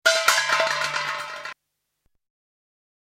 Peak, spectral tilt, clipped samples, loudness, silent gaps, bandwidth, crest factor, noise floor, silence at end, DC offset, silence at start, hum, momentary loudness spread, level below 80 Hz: -2 dBFS; 1 dB/octave; under 0.1%; -21 LUFS; none; 16 kHz; 24 dB; -78 dBFS; 1.5 s; under 0.1%; 0.05 s; none; 16 LU; -70 dBFS